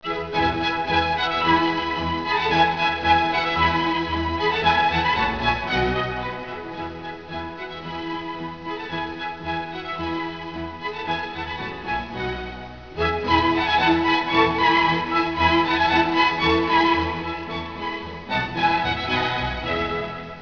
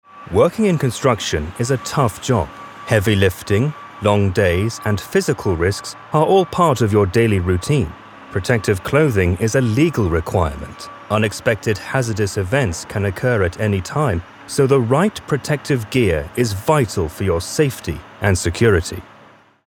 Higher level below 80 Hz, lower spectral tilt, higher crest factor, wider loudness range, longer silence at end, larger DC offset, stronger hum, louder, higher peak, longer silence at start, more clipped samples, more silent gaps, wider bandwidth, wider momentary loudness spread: about the same, -42 dBFS vs -38 dBFS; about the same, -5.5 dB/octave vs -6 dB/octave; about the same, 18 dB vs 16 dB; first, 11 LU vs 2 LU; second, 0 s vs 0.65 s; first, 0.3% vs under 0.1%; neither; second, -22 LUFS vs -18 LUFS; second, -6 dBFS vs 0 dBFS; second, 0 s vs 0.15 s; neither; neither; second, 5.4 kHz vs 18 kHz; first, 13 LU vs 7 LU